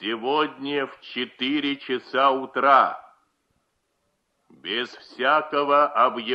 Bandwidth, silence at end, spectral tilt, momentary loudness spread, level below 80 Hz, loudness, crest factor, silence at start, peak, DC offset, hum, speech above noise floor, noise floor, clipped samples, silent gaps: 7.8 kHz; 0 s; -5 dB/octave; 13 LU; -74 dBFS; -22 LUFS; 20 dB; 0 s; -4 dBFS; under 0.1%; none; 50 dB; -73 dBFS; under 0.1%; none